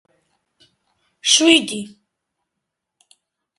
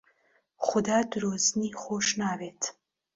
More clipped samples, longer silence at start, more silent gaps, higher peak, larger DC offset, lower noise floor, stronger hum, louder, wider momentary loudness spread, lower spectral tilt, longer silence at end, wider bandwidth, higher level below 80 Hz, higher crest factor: neither; first, 1.25 s vs 0.6 s; neither; first, 0 dBFS vs -10 dBFS; neither; first, -80 dBFS vs -69 dBFS; neither; first, -14 LUFS vs -28 LUFS; first, 19 LU vs 8 LU; second, -1 dB/octave vs -3 dB/octave; first, 1.7 s vs 0.45 s; first, 11.5 kHz vs 7.8 kHz; about the same, -66 dBFS vs -66 dBFS; about the same, 22 dB vs 20 dB